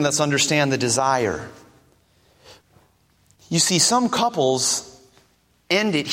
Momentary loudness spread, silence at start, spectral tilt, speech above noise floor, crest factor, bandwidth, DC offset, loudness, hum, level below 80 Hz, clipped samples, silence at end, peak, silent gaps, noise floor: 9 LU; 0 s; -3 dB/octave; 41 dB; 18 dB; 16.5 kHz; under 0.1%; -19 LUFS; none; -58 dBFS; under 0.1%; 0 s; -4 dBFS; none; -61 dBFS